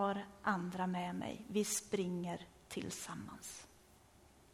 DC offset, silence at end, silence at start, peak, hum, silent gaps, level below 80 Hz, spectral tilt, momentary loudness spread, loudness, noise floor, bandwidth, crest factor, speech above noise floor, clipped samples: under 0.1%; 0.1 s; 0 s; -22 dBFS; none; none; -70 dBFS; -4.5 dB/octave; 12 LU; -41 LUFS; -65 dBFS; 16 kHz; 20 dB; 24 dB; under 0.1%